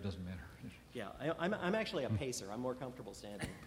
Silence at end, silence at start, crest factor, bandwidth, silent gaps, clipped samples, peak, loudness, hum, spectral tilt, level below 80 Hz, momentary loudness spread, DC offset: 0 s; 0 s; 20 dB; 16 kHz; none; under 0.1%; -22 dBFS; -41 LUFS; none; -5 dB/octave; -62 dBFS; 13 LU; under 0.1%